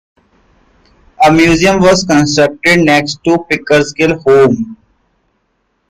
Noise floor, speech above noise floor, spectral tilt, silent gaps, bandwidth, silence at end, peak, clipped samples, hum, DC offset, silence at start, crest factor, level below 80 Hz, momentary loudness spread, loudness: -62 dBFS; 53 dB; -5 dB/octave; none; 15.5 kHz; 1.15 s; 0 dBFS; under 0.1%; none; under 0.1%; 1.2 s; 12 dB; -38 dBFS; 6 LU; -10 LUFS